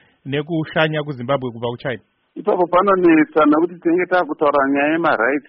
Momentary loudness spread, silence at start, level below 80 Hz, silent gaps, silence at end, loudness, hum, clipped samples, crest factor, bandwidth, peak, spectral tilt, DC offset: 12 LU; 0.25 s; -56 dBFS; none; 0.1 s; -17 LUFS; none; under 0.1%; 14 dB; 5.6 kHz; -4 dBFS; -4.5 dB/octave; under 0.1%